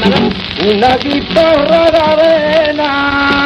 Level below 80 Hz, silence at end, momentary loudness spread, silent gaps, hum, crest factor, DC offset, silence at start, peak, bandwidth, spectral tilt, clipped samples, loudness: -34 dBFS; 0 s; 4 LU; none; none; 10 dB; under 0.1%; 0 s; 0 dBFS; 9.2 kHz; -6 dB/octave; under 0.1%; -10 LUFS